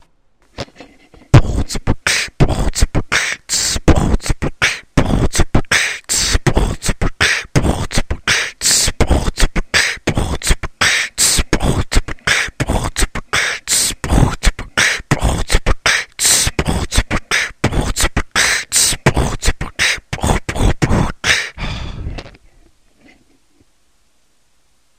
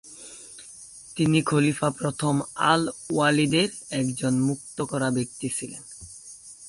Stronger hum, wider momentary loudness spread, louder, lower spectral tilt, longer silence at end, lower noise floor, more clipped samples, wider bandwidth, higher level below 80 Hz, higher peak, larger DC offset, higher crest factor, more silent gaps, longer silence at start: neither; second, 8 LU vs 20 LU; first, -15 LUFS vs -24 LUFS; second, -3 dB/octave vs -5 dB/octave; first, 2.7 s vs 0 s; first, -61 dBFS vs -45 dBFS; neither; first, 16 kHz vs 11.5 kHz; first, -22 dBFS vs -58 dBFS; first, 0 dBFS vs -6 dBFS; first, 0.2% vs under 0.1%; about the same, 16 dB vs 20 dB; neither; first, 0.6 s vs 0.05 s